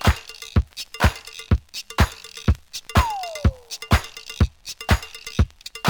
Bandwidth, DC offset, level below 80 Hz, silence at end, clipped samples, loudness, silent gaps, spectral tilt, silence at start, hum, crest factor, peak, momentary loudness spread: over 20 kHz; under 0.1%; -28 dBFS; 0 s; under 0.1%; -24 LUFS; none; -5 dB/octave; 0 s; none; 20 dB; -2 dBFS; 8 LU